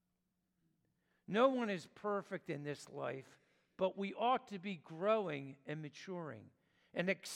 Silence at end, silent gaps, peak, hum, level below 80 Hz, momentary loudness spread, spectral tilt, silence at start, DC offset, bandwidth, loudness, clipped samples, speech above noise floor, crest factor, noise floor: 0 s; none; -18 dBFS; none; -88 dBFS; 14 LU; -5.5 dB/octave; 1.3 s; under 0.1%; 15.5 kHz; -40 LUFS; under 0.1%; 45 dB; 22 dB; -85 dBFS